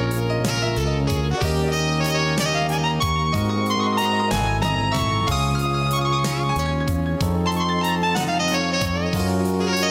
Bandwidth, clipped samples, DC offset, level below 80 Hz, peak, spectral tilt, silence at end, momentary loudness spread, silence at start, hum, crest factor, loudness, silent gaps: 16.5 kHz; under 0.1%; under 0.1%; -36 dBFS; -10 dBFS; -5 dB/octave; 0 s; 2 LU; 0 s; none; 12 dB; -21 LUFS; none